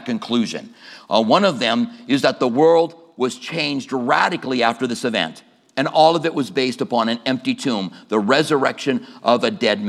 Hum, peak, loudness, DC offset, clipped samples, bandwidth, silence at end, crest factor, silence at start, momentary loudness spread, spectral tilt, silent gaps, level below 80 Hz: none; 0 dBFS; -19 LUFS; under 0.1%; under 0.1%; 13 kHz; 0 s; 18 dB; 0 s; 9 LU; -4.5 dB/octave; none; -74 dBFS